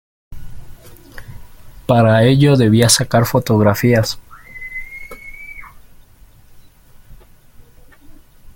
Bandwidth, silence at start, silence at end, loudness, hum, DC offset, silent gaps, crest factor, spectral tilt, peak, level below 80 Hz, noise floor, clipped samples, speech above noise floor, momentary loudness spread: 17 kHz; 0.3 s; 0.05 s; -13 LUFS; none; under 0.1%; none; 18 dB; -5 dB/octave; 0 dBFS; -40 dBFS; -44 dBFS; under 0.1%; 32 dB; 23 LU